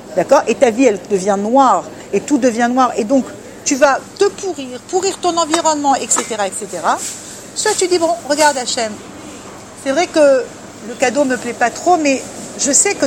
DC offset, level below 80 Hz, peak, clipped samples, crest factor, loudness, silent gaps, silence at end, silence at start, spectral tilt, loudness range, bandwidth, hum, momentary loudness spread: under 0.1%; -54 dBFS; 0 dBFS; under 0.1%; 16 dB; -15 LUFS; none; 0 s; 0 s; -2.5 dB/octave; 3 LU; 17 kHz; none; 14 LU